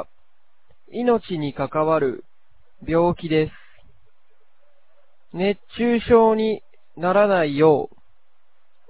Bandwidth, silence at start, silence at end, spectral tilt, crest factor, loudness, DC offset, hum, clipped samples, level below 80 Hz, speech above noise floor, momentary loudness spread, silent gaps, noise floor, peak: 4 kHz; 0 s; 1.05 s; -10.5 dB/octave; 20 dB; -20 LUFS; 0.8%; none; under 0.1%; -50 dBFS; 50 dB; 17 LU; none; -69 dBFS; -2 dBFS